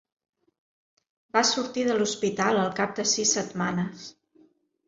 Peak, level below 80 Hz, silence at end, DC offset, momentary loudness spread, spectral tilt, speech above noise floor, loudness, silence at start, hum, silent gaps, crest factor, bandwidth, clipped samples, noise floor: -6 dBFS; -70 dBFS; 0.75 s; under 0.1%; 8 LU; -3 dB/octave; 36 dB; -25 LUFS; 1.35 s; none; none; 22 dB; 7.8 kHz; under 0.1%; -62 dBFS